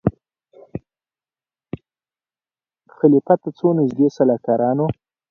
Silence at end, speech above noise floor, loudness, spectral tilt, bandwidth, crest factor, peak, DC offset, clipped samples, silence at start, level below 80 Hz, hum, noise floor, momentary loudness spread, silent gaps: 0.4 s; over 73 dB; -18 LUFS; -10 dB/octave; 6.8 kHz; 20 dB; 0 dBFS; under 0.1%; under 0.1%; 0.05 s; -52 dBFS; none; under -90 dBFS; 20 LU; none